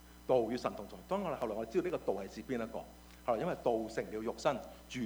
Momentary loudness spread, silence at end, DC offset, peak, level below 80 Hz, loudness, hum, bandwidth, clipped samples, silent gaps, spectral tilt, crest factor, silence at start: 10 LU; 0 s; under 0.1%; -18 dBFS; -60 dBFS; -37 LUFS; none; over 20 kHz; under 0.1%; none; -6 dB/octave; 20 dB; 0 s